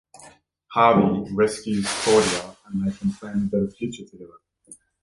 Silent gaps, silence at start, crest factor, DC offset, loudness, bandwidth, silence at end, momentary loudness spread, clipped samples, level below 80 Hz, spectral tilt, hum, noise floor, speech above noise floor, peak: none; 0.2 s; 20 dB; under 0.1%; -22 LUFS; 11.5 kHz; 0.3 s; 15 LU; under 0.1%; -54 dBFS; -5 dB/octave; none; -51 dBFS; 29 dB; -4 dBFS